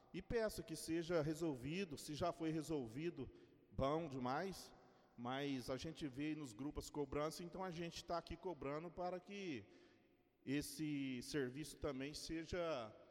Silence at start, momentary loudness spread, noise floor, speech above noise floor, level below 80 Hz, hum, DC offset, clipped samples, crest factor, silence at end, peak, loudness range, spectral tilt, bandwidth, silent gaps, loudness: 0.1 s; 7 LU; -75 dBFS; 30 dB; -64 dBFS; none; under 0.1%; under 0.1%; 18 dB; 0 s; -28 dBFS; 3 LU; -5.5 dB/octave; 16.5 kHz; none; -46 LUFS